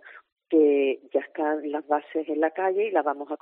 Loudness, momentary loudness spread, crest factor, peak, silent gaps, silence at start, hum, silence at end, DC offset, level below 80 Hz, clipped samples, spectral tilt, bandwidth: -25 LUFS; 9 LU; 16 dB; -10 dBFS; 0.32-0.36 s; 0.05 s; none; 0.05 s; under 0.1%; -88 dBFS; under 0.1%; -2 dB/octave; 3.8 kHz